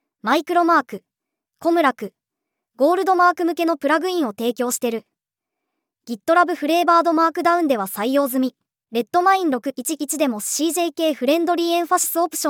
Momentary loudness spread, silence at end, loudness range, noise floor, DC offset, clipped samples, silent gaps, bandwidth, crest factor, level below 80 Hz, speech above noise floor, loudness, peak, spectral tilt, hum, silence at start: 9 LU; 0 s; 2 LU; -84 dBFS; under 0.1%; under 0.1%; none; over 20 kHz; 18 dB; -80 dBFS; 65 dB; -19 LUFS; -2 dBFS; -2.5 dB/octave; none; 0.25 s